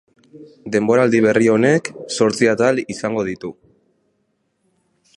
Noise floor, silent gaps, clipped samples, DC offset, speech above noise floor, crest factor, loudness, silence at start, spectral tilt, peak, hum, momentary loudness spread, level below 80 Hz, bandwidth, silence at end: -68 dBFS; none; under 0.1%; under 0.1%; 51 dB; 18 dB; -17 LUFS; 0.35 s; -5.5 dB/octave; -2 dBFS; none; 12 LU; -60 dBFS; 11.5 kHz; 1.65 s